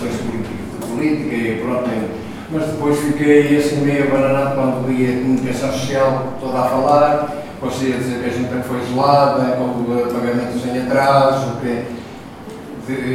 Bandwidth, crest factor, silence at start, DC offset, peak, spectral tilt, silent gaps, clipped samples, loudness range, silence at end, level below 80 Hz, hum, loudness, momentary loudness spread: 16 kHz; 18 dB; 0 s; under 0.1%; 0 dBFS; -6.5 dB/octave; none; under 0.1%; 2 LU; 0 s; -48 dBFS; none; -17 LUFS; 13 LU